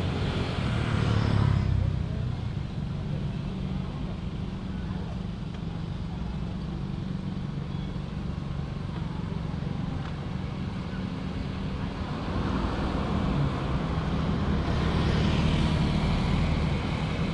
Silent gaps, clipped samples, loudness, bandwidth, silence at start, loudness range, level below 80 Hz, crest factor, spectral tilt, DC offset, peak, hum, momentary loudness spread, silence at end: none; under 0.1%; -30 LUFS; 11 kHz; 0 s; 7 LU; -36 dBFS; 16 dB; -7.5 dB/octave; under 0.1%; -12 dBFS; none; 9 LU; 0 s